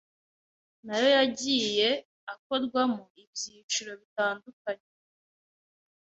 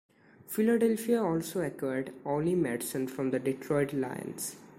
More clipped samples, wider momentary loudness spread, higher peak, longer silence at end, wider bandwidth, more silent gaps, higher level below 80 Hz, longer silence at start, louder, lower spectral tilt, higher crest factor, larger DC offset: neither; first, 15 LU vs 9 LU; first, -12 dBFS vs -16 dBFS; first, 1.4 s vs 0.05 s; second, 8.2 kHz vs 16 kHz; first, 2.05-2.27 s, 2.39-2.50 s, 3.10-3.15 s, 3.27-3.33 s, 3.63-3.69 s, 4.05-4.16 s, 4.53-4.65 s vs none; second, -74 dBFS vs -66 dBFS; first, 0.85 s vs 0.5 s; first, -28 LUFS vs -31 LUFS; second, -2 dB/octave vs -6 dB/octave; about the same, 20 dB vs 16 dB; neither